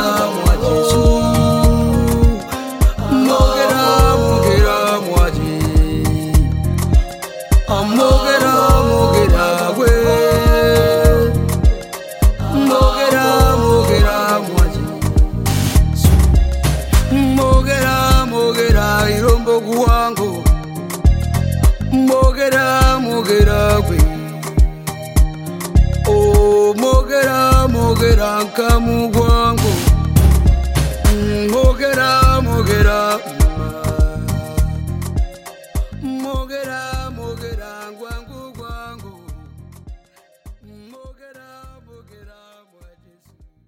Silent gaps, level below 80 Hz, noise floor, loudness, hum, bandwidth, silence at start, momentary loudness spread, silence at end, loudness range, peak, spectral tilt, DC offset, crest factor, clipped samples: none; -18 dBFS; -52 dBFS; -14 LUFS; none; 17 kHz; 0 s; 12 LU; 2 s; 10 LU; 0 dBFS; -5.5 dB/octave; under 0.1%; 14 dB; under 0.1%